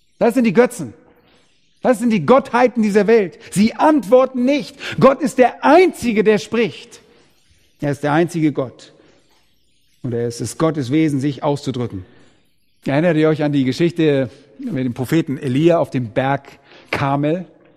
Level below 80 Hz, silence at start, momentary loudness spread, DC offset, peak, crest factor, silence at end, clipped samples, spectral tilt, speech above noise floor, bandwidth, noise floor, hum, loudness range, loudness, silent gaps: -54 dBFS; 0.2 s; 12 LU; under 0.1%; 0 dBFS; 18 dB; 0.3 s; under 0.1%; -6.5 dB/octave; 46 dB; 15 kHz; -62 dBFS; none; 7 LU; -17 LUFS; none